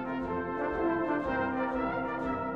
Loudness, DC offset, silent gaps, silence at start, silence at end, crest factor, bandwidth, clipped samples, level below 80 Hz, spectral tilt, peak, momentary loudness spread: -32 LUFS; under 0.1%; none; 0 s; 0 s; 12 dB; 7 kHz; under 0.1%; -52 dBFS; -8 dB/octave; -18 dBFS; 3 LU